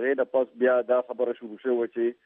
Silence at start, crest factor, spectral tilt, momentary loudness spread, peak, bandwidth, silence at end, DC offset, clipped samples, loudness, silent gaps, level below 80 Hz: 0 s; 14 dB; -8.5 dB/octave; 7 LU; -10 dBFS; 3.7 kHz; 0.1 s; under 0.1%; under 0.1%; -26 LUFS; none; -88 dBFS